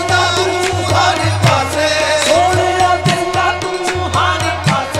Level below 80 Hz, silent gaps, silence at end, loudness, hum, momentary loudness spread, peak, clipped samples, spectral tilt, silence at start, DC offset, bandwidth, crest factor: -38 dBFS; none; 0 s; -13 LUFS; none; 4 LU; 0 dBFS; under 0.1%; -4 dB/octave; 0 s; 0.2%; 15.5 kHz; 14 dB